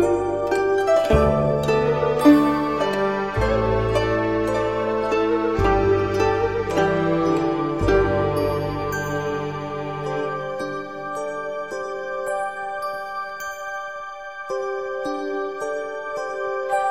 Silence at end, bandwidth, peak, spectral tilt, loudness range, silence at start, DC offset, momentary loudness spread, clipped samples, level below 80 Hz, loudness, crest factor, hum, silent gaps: 0 s; 16 kHz; -2 dBFS; -6.5 dB/octave; 9 LU; 0 s; 0.3%; 11 LU; under 0.1%; -36 dBFS; -22 LUFS; 20 dB; none; none